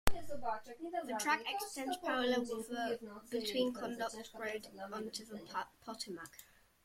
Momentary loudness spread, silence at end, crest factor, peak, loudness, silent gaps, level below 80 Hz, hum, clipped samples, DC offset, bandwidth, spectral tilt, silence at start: 11 LU; 0.4 s; 30 dB; -8 dBFS; -40 LUFS; none; -54 dBFS; none; under 0.1%; under 0.1%; 16.5 kHz; -3 dB/octave; 0.05 s